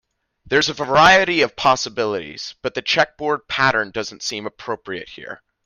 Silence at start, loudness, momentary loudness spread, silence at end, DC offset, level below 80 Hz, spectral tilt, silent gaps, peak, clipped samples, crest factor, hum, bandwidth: 0.45 s; -18 LUFS; 18 LU; 0.3 s; under 0.1%; -52 dBFS; -3 dB/octave; none; 0 dBFS; under 0.1%; 20 dB; none; 15.5 kHz